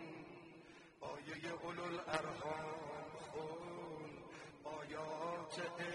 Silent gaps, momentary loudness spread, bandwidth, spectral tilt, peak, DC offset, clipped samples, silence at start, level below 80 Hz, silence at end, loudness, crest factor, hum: none; 12 LU; 11.5 kHz; -4.5 dB/octave; -20 dBFS; under 0.1%; under 0.1%; 0 s; -76 dBFS; 0 s; -47 LUFS; 26 dB; none